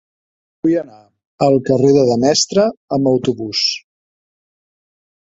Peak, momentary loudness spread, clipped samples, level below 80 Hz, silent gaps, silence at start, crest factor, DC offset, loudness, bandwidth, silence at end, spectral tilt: 0 dBFS; 8 LU; under 0.1%; -56 dBFS; 1.25-1.38 s, 2.77-2.88 s; 0.65 s; 16 dB; under 0.1%; -15 LUFS; 8 kHz; 1.4 s; -5 dB/octave